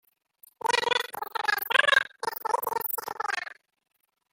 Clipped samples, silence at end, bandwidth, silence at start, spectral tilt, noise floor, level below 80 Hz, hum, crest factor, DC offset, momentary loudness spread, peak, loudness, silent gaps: under 0.1%; 0.8 s; 17 kHz; 0.65 s; 0.5 dB/octave; -60 dBFS; -76 dBFS; none; 24 dB; under 0.1%; 11 LU; -4 dBFS; -27 LUFS; none